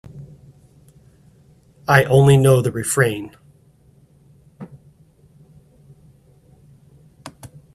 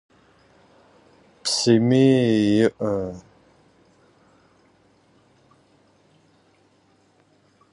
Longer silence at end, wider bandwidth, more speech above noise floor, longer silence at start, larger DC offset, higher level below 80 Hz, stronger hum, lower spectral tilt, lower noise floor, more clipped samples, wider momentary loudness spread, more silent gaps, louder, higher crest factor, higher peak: second, 0.3 s vs 4.55 s; first, 14 kHz vs 11.5 kHz; second, 38 dB vs 42 dB; second, 0.15 s vs 1.45 s; neither; first, -52 dBFS vs -60 dBFS; neither; about the same, -5.5 dB/octave vs -5.5 dB/octave; second, -53 dBFS vs -60 dBFS; neither; first, 29 LU vs 13 LU; neither; first, -16 LUFS vs -20 LUFS; about the same, 22 dB vs 20 dB; first, 0 dBFS vs -6 dBFS